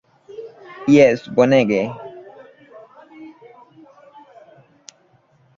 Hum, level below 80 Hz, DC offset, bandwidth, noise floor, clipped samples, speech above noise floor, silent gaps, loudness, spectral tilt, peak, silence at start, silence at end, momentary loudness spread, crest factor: none; -60 dBFS; under 0.1%; 7.6 kHz; -57 dBFS; under 0.1%; 43 dB; none; -16 LUFS; -6.5 dB/octave; 0 dBFS; 0.4 s; 2.3 s; 27 LU; 20 dB